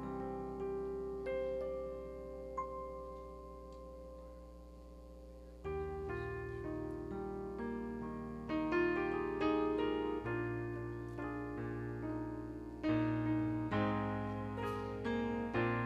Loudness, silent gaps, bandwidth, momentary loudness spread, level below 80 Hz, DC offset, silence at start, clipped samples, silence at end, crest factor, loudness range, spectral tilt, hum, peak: -40 LUFS; none; 10.5 kHz; 17 LU; -54 dBFS; under 0.1%; 0 s; under 0.1%; 0 s; 16 dB; 10 LU; -8 dB/octave; 60 Hz at -55 dBFS; -22 dBFS